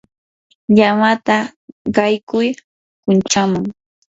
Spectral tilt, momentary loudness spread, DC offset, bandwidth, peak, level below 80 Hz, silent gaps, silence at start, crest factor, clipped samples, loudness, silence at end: -5 dB/octave; 15 LU; under 0.1%; 7.8 kHz; 0 dBFS; -54 dBFS; 1.56-1.85 s, 2.23-2.27 s, 2.64-3.03 s; 0.7 s; 16 dB; under 0.1%; -16 LUFS; 0.4 s